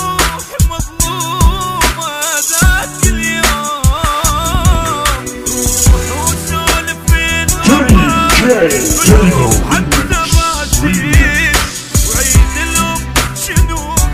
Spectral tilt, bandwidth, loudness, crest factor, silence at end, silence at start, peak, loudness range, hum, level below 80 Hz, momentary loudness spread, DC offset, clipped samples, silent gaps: -3.5 dB/octave; 16.5 kHz; -11 LUFS; 12 dB; 0 s; 0 s; 0 dBFS; 3 LU; none; -16 dBFS; 6 LU; under 0.1%; 0.4%; none